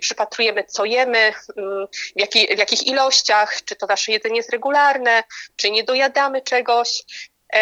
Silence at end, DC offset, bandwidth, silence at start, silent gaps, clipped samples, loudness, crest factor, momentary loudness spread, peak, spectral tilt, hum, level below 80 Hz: 0 s; under 0.1%; 9 kHz; 0 s; none; under 0.1%; -17 LUFS; 18 dB; 11 LU; 0 dBFS; 0.5 dB/octave; none; -72 dBFS